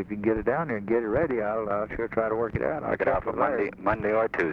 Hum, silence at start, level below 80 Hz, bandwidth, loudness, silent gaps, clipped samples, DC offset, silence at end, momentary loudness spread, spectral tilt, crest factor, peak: none; 0 s; -48 dBFS; 6.2 kHz; -27 LUFS; none; under 0.1%; under 0.1%; 0 s; 3 LU; -9 dB/octave; 18 dB; -10 dBFS